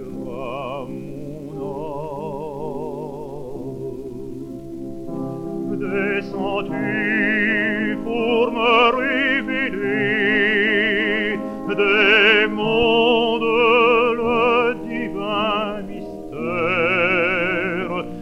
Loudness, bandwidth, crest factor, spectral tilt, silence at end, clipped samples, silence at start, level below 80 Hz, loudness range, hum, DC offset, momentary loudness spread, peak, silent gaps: -19 LUFS; 11.5 kHz; 18 dB; -6 dB/octave; 0 s; under 0.1%; 0 s; -46 dBFS; 14 LU; none; under 0.1%; 17 LU; -2 dBFS; none